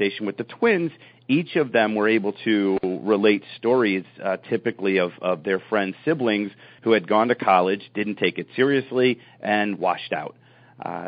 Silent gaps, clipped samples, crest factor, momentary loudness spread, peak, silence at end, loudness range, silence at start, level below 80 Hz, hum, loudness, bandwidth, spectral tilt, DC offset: none; under 0.1%; 18 dB; 10 LU; -4 dBFS; 0 s; 2 LU; 0 s; -70 dBFS; none; -22 LUFS; 5 kHz; -4 dB/octave; under 0.1%